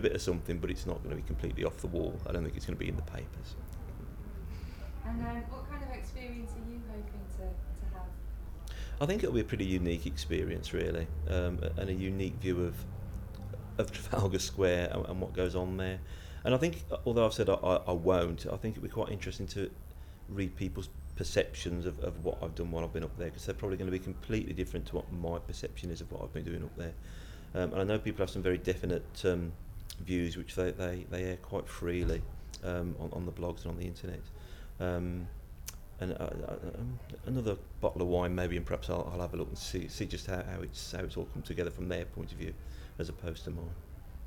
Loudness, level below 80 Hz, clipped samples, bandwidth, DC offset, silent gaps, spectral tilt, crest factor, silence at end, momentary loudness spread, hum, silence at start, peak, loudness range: -37 LUFS; -44 dBFS; under 0.1%; 18.5 kHz; under 0.1%; none; -6 dB/octave; 20 dB; 0 s; 12 LU; none; 0 s; -16 dBFS; 8 LU